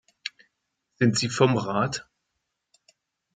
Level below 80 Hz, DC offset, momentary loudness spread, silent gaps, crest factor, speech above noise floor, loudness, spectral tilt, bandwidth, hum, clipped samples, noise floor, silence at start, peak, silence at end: -64 dBFS; under 0.1%; 16 LU; none; 22 dB; 57 dB; -24 LUFS; -5 dB/octave; 9.6 kHz; none; under 0.1%; -80 dBFS; 0.25 s; -6 dBFS; 1.35 s